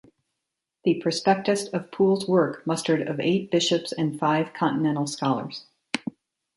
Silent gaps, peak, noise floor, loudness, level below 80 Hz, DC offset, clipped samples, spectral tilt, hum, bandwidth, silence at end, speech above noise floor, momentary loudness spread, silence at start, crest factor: none; -4 dBFS; -84 dBFS; -25 LUFS; -70 dBFS; under 0.1%; under 0.1%; -5 dB/octave; none; 11.5 kHz; 0.45 s; 60 dB; 9 LU; 0.85 s; 20 dB